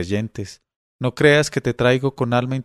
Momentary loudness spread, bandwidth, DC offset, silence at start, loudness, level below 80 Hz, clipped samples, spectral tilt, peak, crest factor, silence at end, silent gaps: 15 LU; 13 kHz; under 0.1%; 0 s; -19 LUFS; -48 dBFS; under 0.1%; -5.5 dB/octave; 0 dBFS; 20 dB; 0 s; 0.76-0.99 s